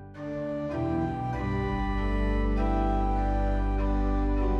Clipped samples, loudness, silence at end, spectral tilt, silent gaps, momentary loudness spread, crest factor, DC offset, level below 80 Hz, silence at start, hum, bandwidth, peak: under 0.1%; -29 LUFS; 0 s; -9 dB/octave; none; 5 LU; 10 dB; under 0.1%; -30 dBFS; 0 s; none; 5.8 kHz; -16 dBFS